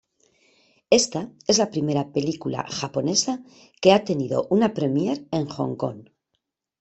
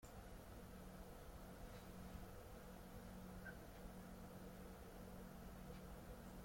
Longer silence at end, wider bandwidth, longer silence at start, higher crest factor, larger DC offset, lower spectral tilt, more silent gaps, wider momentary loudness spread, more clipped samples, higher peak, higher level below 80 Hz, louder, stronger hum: first, 0.8 s vs 0 s; second, 8.4 kHz vs 16.5 kHz; first, 0.9 s vs 0 s; first, 22 dB vs 14 dB; neither; about the same, -4.5 dB/octave vs -5.5 dB/octave; neither; first, 10 LU vs 2 LU; neither; first, -2 dBFS vs -42 dBFS; about the same, -62 dBFS vs -62 dBFS; first, -23 LUFS vs -58 LUFS; neither